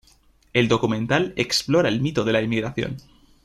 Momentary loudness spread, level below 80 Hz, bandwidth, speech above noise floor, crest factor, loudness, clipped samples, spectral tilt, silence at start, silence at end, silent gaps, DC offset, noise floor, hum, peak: 8 LU; -52 dBFS; 14 kHz; 36 dB; 20 dB; -22 LUFS; under 0.1%; -5 dB/octave; 0.55 s; 0.45 s; none; under 0.1%; -57 dBFS; none; -4 dBFS